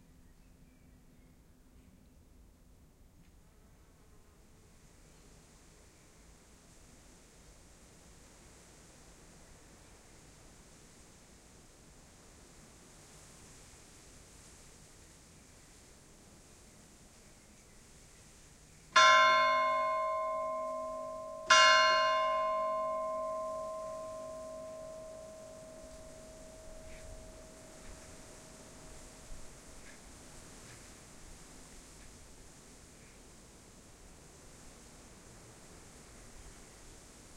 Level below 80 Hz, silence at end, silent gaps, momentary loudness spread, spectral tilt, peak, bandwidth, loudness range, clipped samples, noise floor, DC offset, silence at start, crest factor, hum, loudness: -60 dBFS; 0 s; none; 30 LU; -1 dB/octave; -10 dBFS; 15.5 kHz; 27 LU; under 0.1%; -61 dBFS; under 0.1%; 13.15 s; 28 dB; none; -29 LUFS